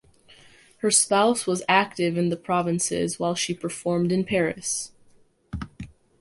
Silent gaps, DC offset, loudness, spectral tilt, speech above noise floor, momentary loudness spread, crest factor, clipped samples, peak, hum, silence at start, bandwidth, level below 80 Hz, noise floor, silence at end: none; under 0.1%; -23 LUFS; -3.5 dB/octave; 34 dB; 17 LU; 18 dB; under 0.1%; -6 dBFS; none; 0.85 s; 11.5 kHz; -52 dBFS; -58 dBFS; 0.35 s